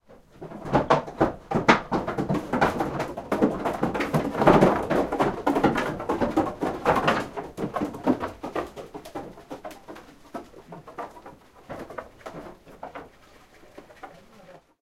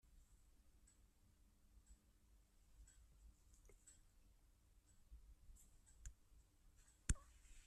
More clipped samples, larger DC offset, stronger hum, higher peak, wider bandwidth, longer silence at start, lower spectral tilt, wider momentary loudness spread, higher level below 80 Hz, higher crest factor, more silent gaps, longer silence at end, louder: neither; neither; neither; first, -2 dBFS vs -24 dBFS; first, 16 kHz vs 13.5 kHz; about the same, 0.1 s vs 0.05 s; first, -6.5 dB/octave vs -3.5 dB/octave; about the same, 22 LU vs 21 LU; first, -48 dBFS vs -60 dBFS; second, 24 dB vs 34 dB; neither; first, 0.25 s vs 0 s; first, -25 LUFS vs -52 LUFS